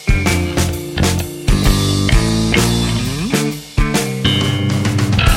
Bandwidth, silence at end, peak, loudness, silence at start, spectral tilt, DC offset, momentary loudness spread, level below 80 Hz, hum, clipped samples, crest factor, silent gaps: 16.5 kHz; 0 s; 0 dBFS; -16 LUFS; 0 s; -4.5 dB/octave; under 0.1%; 4 LU; -20 dBFS; none; under 0.1%; 14 dB; none